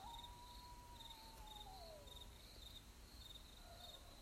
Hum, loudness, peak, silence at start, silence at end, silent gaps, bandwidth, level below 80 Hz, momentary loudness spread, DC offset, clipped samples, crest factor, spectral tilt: none; -58 LUFS; -44 dBFS; 0 s; 0 s; none; 16 kHz; -62 dBFS; 3 LU; under 0.1%; under 0.1%; 14 dB; -3 dB/octave